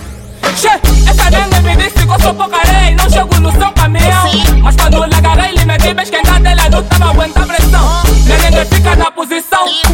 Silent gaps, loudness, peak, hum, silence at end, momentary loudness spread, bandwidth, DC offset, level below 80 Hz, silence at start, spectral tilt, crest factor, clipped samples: none; -9 LUFS; 0 dBFS; none; 0 s; 3 LU; 17 kHz; 0.6%; -10 dBFS; 0 s; -4.5 dB/octave; 8 dB; under 0.1%